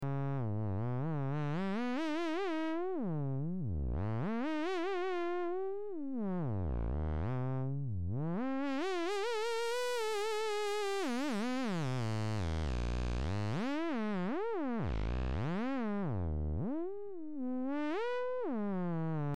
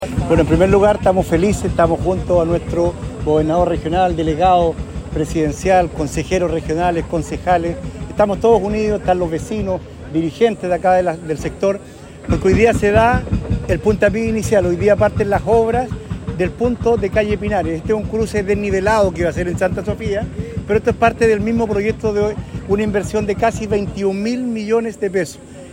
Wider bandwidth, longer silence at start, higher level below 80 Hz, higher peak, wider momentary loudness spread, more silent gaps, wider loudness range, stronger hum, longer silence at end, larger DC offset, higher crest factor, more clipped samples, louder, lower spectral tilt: second, 14.5 kHz vs 16.5 kHz; about the same, 0 s vs 0 s; second, -46 dBFS vs -30 dBFS; second, -26 dBFS vs -2 dBFS; second, 3 LU vs 9 LU; neither; about the same, 2 LU vs 3 LU; neither; about the same, 0 s vs 0 s; first, 0.7% vs under 0.1%; second, 10 dB vs 16 dB; neither; second, -37 LUFS vs -17 LUFS; about the same, -6.5 dB/octave vs -6.5 dB/octave